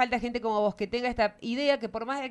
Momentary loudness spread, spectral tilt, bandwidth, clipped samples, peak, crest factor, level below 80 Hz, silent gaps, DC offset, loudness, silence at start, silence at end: 4 LU; -5 dB/octave; 11 kHz; under 0.1%; -10 dBFS; 18 dB; -54 dBFS; none; under 0.1%; -29 LUFS; 0 s; 0 s